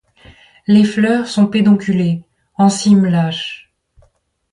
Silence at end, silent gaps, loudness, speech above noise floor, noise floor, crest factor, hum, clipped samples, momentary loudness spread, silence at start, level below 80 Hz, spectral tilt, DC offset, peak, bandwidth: 0.95 s; none; -14 LUFS; 45 dB; -58 dBFS; 14 dB; none; under 0.1%; 15 LU; 0.7 s; -54 dBFS; -6 dB/octave; under 0.1%; -2 dBFS; 11 kHz